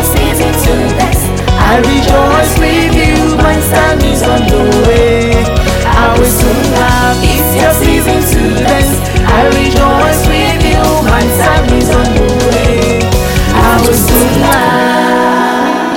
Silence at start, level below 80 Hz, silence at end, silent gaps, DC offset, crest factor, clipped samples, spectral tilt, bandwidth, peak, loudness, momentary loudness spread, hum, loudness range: 0 s; -14 dBFS; 0 s; none; under 0.1%; 8 dB; 0.1%; -5 dB/octave; over 20 kHz; 0 dBFS; -9 LUFS; 3 LU; none; 1 LU